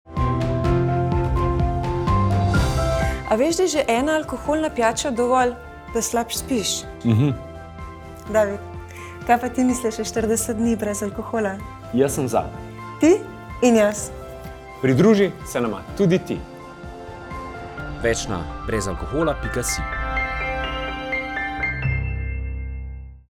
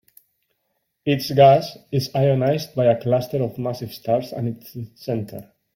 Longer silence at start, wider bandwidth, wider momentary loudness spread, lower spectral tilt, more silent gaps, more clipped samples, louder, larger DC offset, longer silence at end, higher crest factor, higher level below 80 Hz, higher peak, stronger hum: second, 0.05 s vs 1.05 s; first, 19.5 kHz vs 16.5 kHz; about the same, 16 LU vs 17 LU; second, -5.5 dB/octave vs -7 dB/octave; neither; neither; about the same, -22 LUFS vs -21 LUFS; neither; second, 0.1 s vs 0.35 s; about the same, 18 dB vs 18 dB; first, -34 dBFS vs -58 dBFS; about the same, -4 dBFS vs -2 dBFS; neither